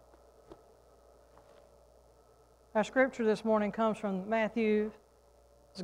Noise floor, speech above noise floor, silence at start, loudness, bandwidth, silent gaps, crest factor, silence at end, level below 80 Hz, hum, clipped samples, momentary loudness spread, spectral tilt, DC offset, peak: -63 dBFS; 32 dB; 0.5 s; -31 LUFS; 11 kHz; none; 20 dB; 0 s; -66 dBFS; none; under 0.1%; 7 LU; -6.5 dB/octave; under 0.1%; -14 dBFS